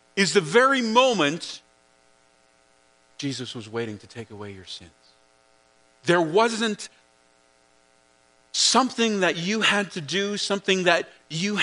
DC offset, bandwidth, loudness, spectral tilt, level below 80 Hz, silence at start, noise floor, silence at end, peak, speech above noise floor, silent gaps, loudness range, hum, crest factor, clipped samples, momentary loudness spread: under 0.1%; 10.5 kHz; -22 LUFS; -3 dB/octave; -72 dBFS; 0.15 s; -61 dBFS; 0 s; -2 dBFS; 38 dB; none; 14 LU; none; 22 dB; under 0.1%; 20 LU